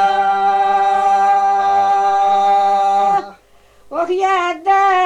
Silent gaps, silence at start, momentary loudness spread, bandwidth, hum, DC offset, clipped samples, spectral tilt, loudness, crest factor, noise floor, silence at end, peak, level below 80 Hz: none; 0 s; 4 LU; 8.6 kHz; none; under 0.1%; under 0.1%; -3.5 dB/octave; -14 LUFS; 8 dB; -48 dBFS; 0 s; -6 dBFS; -56 dBFS